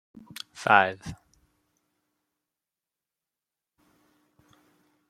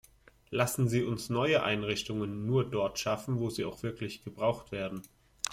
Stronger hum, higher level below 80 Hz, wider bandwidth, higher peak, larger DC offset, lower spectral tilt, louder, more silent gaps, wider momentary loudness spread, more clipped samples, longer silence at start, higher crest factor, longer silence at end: neither; second, -66 dBFS vs -60 dBFS; about the same, 15 kHz vs 16.5 kHz; first, -2 dBFS vs -8 dBFS; neither; about the same, -4 dB/octave vs -5 dB/octave; first, -23 LUFS vs -32 LUFS; neither; first, 23 LU vs 10 LU; neither; about the same, 0.6 s vs 0.5 s; first, 30 dB vs 24 dB; first, 3.95 s vs 0 s